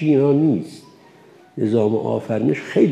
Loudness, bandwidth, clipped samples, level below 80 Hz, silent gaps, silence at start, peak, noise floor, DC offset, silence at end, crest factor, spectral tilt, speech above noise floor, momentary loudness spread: -19 LUFS; 10.5 kHz; under 0.1%; -68 dBFS; none; 0 s; -4 dBFS; -48 dBFS; under 0.1%; 0 s; 14 dB; -8.5 dB/octave; 30 dB; 9 LU